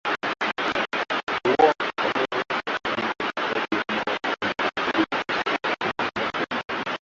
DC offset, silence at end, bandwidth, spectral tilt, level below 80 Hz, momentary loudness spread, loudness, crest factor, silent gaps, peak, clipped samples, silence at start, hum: under 0.1%; 0.05 s; 7.8 kHz; -4 dB/octave; -62 dBFS; 5 LU; -25 LUFS; 20 dB; 1.23-1.27 s; -4 dBFS; under 0.1%; 0.05 s; none